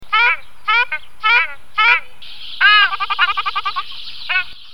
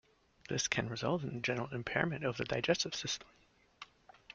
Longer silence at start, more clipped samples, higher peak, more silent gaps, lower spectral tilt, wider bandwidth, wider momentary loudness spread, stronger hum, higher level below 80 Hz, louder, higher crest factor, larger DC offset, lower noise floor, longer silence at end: second, 0 s vs 0.5 s; neither; first, 0 dBFS vs -14 dBFS; neither; second, 0 dB/octave vs -3.5 dB/octave; first, 18 kHz vs 9.2 kHz; second, 14 LU vs 17 LU; neither; first, -54 dBFS vs -66 dBFS; first, -15 LUFS vs -36 LUFS; second, 16 dB vs 24 dB; first, 4% vs under 0.1%; second, -36 dBFS vs -59 dBFS; about the same, 0 s vs 0 s